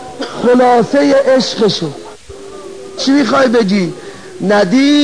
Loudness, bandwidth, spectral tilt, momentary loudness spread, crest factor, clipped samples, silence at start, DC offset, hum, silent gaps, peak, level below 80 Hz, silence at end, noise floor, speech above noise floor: -11 LUFS; 10.5 kHz; -5 dB/octave; 21 LU; 12 dB; under 0.1%; 0 s; 1%; none; none; 0 dBFS; -52 dBFS; 0 s; -31 dBFS; 21 dB